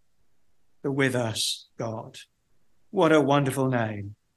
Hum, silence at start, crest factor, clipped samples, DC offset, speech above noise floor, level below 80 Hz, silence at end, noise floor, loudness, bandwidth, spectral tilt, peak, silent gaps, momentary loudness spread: none; 0.85 s; 20 dB; under 0.1%; under 0.1%; 50 dB; -64 dBFS; 0.25 s; -75 dBFS; -25 LUFS; 12.5 kHz; -5 dB/octave; -6 dBFS; none; 15 LU